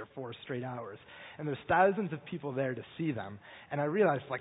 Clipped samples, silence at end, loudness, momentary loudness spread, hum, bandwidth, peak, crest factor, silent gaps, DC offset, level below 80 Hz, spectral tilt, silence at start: under 0.1%; 0 s; -33 LUFS; 18 LU; none; 3.9 kHz; -12 dBFS; 20 dB; none; under 0.1%; -68 dBFS; -2.5 dB/octave; 0 s